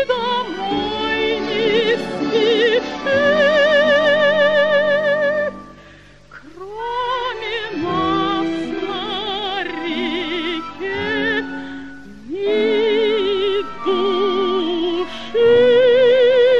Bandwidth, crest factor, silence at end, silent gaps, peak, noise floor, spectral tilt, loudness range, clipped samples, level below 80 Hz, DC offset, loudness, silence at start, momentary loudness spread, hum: 8 kHz; 14 dB; 0 s; none; -4 dBFS; -44 dBFS; -5 dB/octave; 7 LU; under 0.1%; -50 dBFS; 0.8%; -17 LUFS; 0 s; 12 LU; none